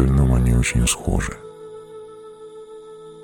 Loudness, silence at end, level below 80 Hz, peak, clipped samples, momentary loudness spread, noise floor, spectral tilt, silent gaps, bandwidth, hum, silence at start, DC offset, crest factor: -19 LUFS; 0 s; -26 dBFS; -4 dBFS; under 0.1%; 23 LU; -39 dBFS; -5 dB/octave; none; 18 kHz; none; 0 s; under 0.1%; 16 dB